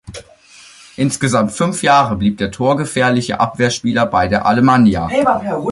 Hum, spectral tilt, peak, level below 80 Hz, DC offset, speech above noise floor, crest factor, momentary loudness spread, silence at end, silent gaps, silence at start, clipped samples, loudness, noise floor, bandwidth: none; -5.5 dB/octave; -2 dBFS; -40 dBFS; under 0.1%; 29 dB; 14 dB; 6 LU; 0 s; none; 0.05 s; under 0.1%; -15 LUFS; -43 dBFS; 11.5 kHz